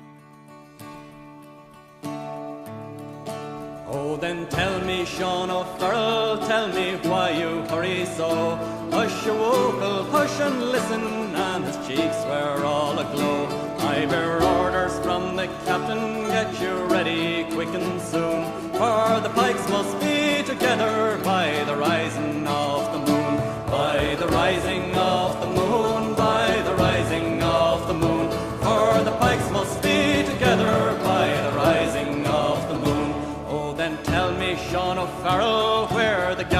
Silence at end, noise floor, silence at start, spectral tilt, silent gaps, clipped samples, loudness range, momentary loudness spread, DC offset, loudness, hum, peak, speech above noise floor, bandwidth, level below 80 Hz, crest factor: 0 s; -47 dBFS; 0 s; -5 dB/octave; none; under 0.1%; 4 LU; 7 LU; under 0.1%; -23 LUFS; none; -6 dBFS; 24 dB; 16 kHz; -46 dBFS; 18 dB